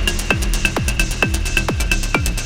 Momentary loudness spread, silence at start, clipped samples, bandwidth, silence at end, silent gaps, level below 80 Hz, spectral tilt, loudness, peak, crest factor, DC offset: 2 LU; 0 s; under 0.1%; 17 kHz; 0 s; none; -22 dBFS; -3.5 dB/octave; -18 LUFS; 0 dBFS; 18 dB; under 0.1%